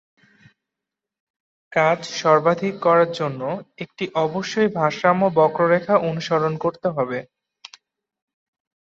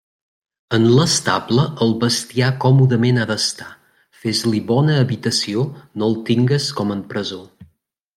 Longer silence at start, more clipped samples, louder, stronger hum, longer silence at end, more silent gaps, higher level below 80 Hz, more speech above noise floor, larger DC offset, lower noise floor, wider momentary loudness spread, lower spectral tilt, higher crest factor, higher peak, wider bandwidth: first, 1.7 s vs 0.7 s; neither; about the same, -20 LUFS vs -18 LUFS; neither; first, 1.55 s vs 0.55 s; neither; second, -66 dBFS vs -56 dBFS; first, 66 dB vs 44 dB; neither; first, -86 dBFS vs -61 dBFS; about the same, 10 LU vs 11 LU; about the same, -6 dB/octave vs -5 dB/octave; about the same, 18 dB vs 16 dB; about the same, -4 dBFS vs -2 dBFS; second, 7.8 kHz vs 14 kHz